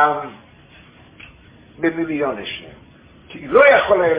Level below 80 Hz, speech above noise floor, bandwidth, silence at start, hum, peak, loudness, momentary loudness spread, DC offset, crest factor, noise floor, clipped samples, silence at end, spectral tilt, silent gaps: -52 dBFS; 30 dB; 4 kHz; 0 s; none; 0 dBFS; -16 LUFS; 23 LU; under 0.1%; 18 dB; -46 dBFS; under 0.1%; 0 s; -8.5 dB/octave; none